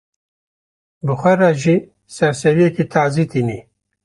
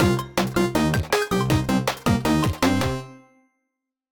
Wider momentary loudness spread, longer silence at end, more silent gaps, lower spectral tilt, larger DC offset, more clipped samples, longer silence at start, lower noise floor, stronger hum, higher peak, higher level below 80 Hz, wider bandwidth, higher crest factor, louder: first, 11 LU vs 3 LU; second, 0.45 s vs 0.95 s; neither; first, -7 dB/octave vs -5.5 dB/octave; neither; neither; first, 1.05 s vs 0 s; first, under -90 dBFS vs -81 dBFS; neither; first, -2 dBFS vs -6 dBFS; second, -54 dBFS vs -40 dBFS; second, 11.5 kHz vs 19.5 kHz; about the same, 16 dB vs 16 dB; first, -16 LUFS vs -22 LUFS